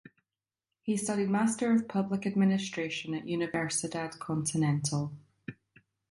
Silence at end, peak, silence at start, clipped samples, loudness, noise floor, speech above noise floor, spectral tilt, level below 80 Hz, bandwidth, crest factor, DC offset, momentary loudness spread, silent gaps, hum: 0.6 s; -16 dBFS; 0.85 s; under 0.1%; -31 LUFS; under -90 dBFS; over 60 dB; -5 dB/octave; -70 dBFS; 11.5 kHz; 16 dB; under 0.1%; 12 LU; none; none